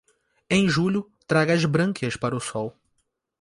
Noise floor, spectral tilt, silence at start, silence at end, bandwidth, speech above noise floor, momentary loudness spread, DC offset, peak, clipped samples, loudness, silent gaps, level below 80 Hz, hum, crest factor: -74 dBFS; -5.5 dB/octave; 0.5 s; 0.7 s; 11.5 kHz; 51 dB; 10 LU; under 0.1%; -6 dBFS; under 0.1%; -23 LUFS; none; -56 dBFS; none; 18 dB